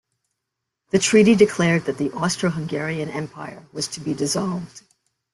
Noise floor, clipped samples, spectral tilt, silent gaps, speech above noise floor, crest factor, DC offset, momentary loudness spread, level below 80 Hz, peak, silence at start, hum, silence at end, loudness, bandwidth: -81 dBFS; under 0.1%; -5 dB/octave; none; 61 dB; 20 dB; under 0.1%; 16 LU; -58 dBFS; -2 dBFS; 0.95 s; none; 0.55 s; -21 LUFS; 12.5 kHz